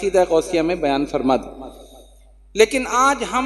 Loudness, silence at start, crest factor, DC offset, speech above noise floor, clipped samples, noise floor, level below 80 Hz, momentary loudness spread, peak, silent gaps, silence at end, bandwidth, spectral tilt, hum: -18 LUFS; 0 s; 20 dB; under 0.1%; 29 dB; under 0.1%; -48 dBFS; -44 dBFS; 16 LU; 0 dBFS; none; 0 s; 12.5 kHz; -3.5 dB/octave; none